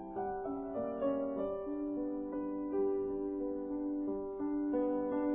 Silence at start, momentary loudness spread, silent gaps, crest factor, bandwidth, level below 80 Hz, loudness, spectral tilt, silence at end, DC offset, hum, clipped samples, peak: 0 s; 5 LU; none; 12 dB; 3.2 kHz; -62 dBFS; -37 LUFS; -4.5 dB/octave; 0 s; under 0.1%; none; under 0.1%; -24 dBFS